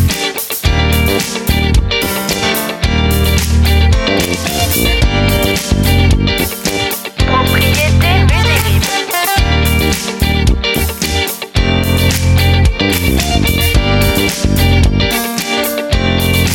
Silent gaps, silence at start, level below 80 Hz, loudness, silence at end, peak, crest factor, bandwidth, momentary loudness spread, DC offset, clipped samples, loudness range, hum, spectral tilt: none; 0 s; -18 dBFS; -12 LUFS; 0 s; 0 dBFS; 12 dB; 19 kHz; 4 LU; under 0.1%; under 0.1%; 1 LU; none; -4.5 dB/octave